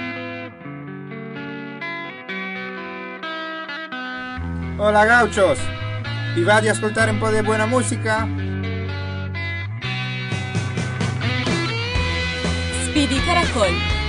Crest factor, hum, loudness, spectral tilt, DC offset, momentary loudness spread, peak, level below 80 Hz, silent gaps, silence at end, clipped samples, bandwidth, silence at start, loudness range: 16 dB; none; -21 LUFS; -5 dB/octave; under 0.1%; 14 LU; -6 dBFS; -34 dBFS; none; 0 s; under 0.1%; 11 kHz; 0 s; 11 LU